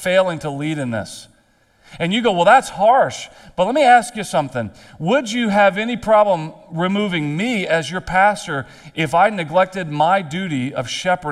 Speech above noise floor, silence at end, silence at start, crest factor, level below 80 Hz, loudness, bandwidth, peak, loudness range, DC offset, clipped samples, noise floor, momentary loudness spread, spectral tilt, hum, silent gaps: 39 dB; 0 s; 0 s; 18 dB; -50 dBFS; -17 LUFS; 13.5 kHz; 0 dBFS; 2 LU; under 0.1%; under 0.1%; -57 dBFS; 13 LU; -5 dB/octave; none; none